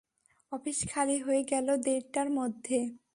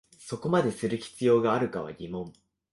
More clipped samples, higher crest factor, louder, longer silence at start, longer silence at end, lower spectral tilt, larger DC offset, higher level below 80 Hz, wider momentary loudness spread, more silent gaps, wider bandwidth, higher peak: neither; about the same, 16 dB vs 16 dB; second, -31 LUFS vs -28 LUFS; first, 0.5 s vs 0.2 s; second, 0.15 s vs 0.4 s; second, -3.5 dB/octave vs -6.5 dB/octave; neither; about the same, -66 dBFS vs -62 dBFS; second, 5 LU vs 15 LU; neither; about the same, 11.5 kHz vs 11.5 kHz; second, -16 dBFS vs -12 dBFS